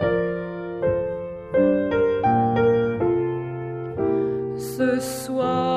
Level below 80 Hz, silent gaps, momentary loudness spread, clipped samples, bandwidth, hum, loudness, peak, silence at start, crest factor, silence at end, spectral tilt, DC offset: -48 dBFS; none; 10 LU; under 0.1%; 15.5 kHz; none; -23 LUFS; -8 dBFS; 0 s; 14 dB; 0 s; -6.5 dB/octave; under 0.1%